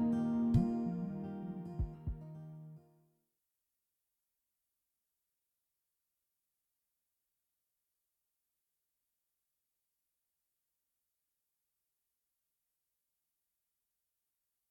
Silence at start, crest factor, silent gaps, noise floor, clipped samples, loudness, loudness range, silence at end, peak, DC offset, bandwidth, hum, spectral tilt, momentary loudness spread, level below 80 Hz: 0 s; 26 dB; none; -88 dBFS; under 0.1%; -37 LUFS; 20 LU; 11.9 s; -18 dBFS; under 0.1%; 6.4 kHz; none; -10 dB/octave; 19 LU; -56 dBFS